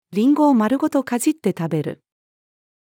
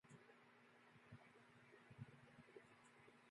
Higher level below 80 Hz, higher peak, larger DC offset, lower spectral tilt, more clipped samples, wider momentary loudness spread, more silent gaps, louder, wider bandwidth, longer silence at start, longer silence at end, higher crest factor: first, -72 dBFS vs -90 dBFS; first, -6 dBFS vs -44 dBFS; neither; about the same, -6 dB/octave vs -6 dB/octave; neither; about the same, 9 LU vs 7 LU; neither; first, -19 LUFS vs -66 LUFS; first, 17.5 kHz vs 11 kHz; about the same, 0.1 s vs 0.05 s; first, 0.9 s vs 0 s; second, 14 dB vs 22 dB